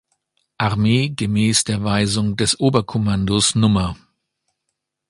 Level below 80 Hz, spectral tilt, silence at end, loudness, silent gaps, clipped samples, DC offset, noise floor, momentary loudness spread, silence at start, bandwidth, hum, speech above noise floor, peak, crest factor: -42 dBFS; -4.5 dB/octave; 1.15 s; -18 LUFS; none; under 0.1%; under 0.1%; -77 dBFS; 5 LU; 0.6 s; 11.5 kHz; none; 60 dB; 0 dBFS; 18 dB